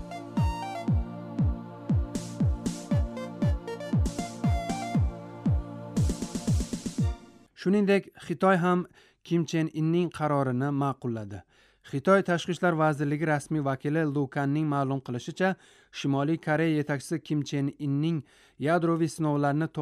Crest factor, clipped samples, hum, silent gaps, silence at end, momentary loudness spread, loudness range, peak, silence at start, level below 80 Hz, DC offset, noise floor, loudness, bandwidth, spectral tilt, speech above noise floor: 18 dB; under 0.1%; none; none; 0 s; 9 LU; 3 LU; -10 dBFS; 0 s; -40 dBFS; under 0.1%; -48 dBFS; -28 LUFS; 13.5 kHz; -7 dB/octave; 21 dB